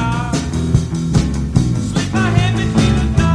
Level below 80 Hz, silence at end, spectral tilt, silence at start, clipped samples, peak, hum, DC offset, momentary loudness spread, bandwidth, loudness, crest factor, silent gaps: -24 dBFS; 0 s; -6 dB/octave; 0 s; under 0.1%; 0 dBFS; none; under 0.1%; 4 LU; 11 kHz; -16 LUFS; 14 dB; none